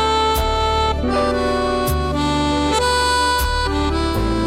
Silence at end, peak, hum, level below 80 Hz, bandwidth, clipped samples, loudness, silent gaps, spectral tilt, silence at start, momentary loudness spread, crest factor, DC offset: 0 s; -8 dBFS; none; -26 dBFS; 16 kHz; under 0.1%; -18 LUFS; none; -4.5 dB/octave; 0 s; 3 LU; 10 dB; under 0.1%